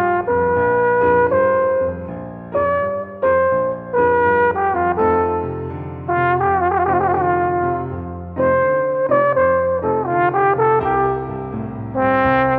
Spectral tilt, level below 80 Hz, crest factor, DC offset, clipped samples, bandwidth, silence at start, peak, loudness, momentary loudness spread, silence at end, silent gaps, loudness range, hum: -10.5 dB/octave; -44 dBFS; 14 dB; under 0.1%; under 0.1%; 4.5 kHz; 0 s; -4 dBFS; -17 LUFS; 11 LU; 0 s; none; 1 LU; none